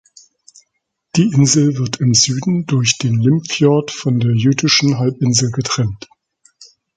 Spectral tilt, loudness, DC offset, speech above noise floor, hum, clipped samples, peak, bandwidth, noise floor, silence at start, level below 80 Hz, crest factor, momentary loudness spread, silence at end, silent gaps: -4.5 dB/octave; -15 LUFS; under 0.1%; 57 dB; none; under 0.1%; 0 dBFS; 9.4 kHz; -71 dBFS; 1.15 s; -50 dBFS; 16 dB; 6 LU; 0.3 s; none